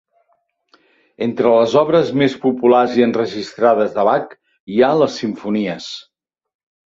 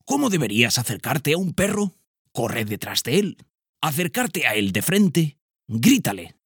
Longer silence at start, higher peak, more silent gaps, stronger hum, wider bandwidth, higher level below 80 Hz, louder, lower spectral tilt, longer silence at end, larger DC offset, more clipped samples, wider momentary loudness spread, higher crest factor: first, 1.2 s vs 0.05 s; about the same, 0 dBFS vs -2 dBFS; second, 4.60-4.67 s vs 2.07-2.25 s, 3.69-3.73 s, 5.42-5.49 s; neither; second, 7.8 kHz vs 19 kHz; about the same, -60 dBFS vs -56 dBFS; first, -16 LUFS vs -22 LUFS; first, -6 dB/octave vs -4 dB/octave; first, 0.85 s vs 0.2 s; neither; neither; about the same, 11 LU vs 9 LU; about the same, 16 dB vs 20 dB